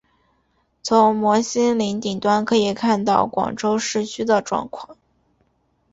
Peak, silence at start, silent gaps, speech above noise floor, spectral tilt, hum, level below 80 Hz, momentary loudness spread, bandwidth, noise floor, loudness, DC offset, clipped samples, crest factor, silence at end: -2 dBFS; 0.85 s; none; 46 dB; -4.5 dB/octave; none; -58 dBFS; 9 LU; 8 kHz; -66 dBFS; -19 LUFS; under 0.1%; under 0.1%; 18 dB; 1 s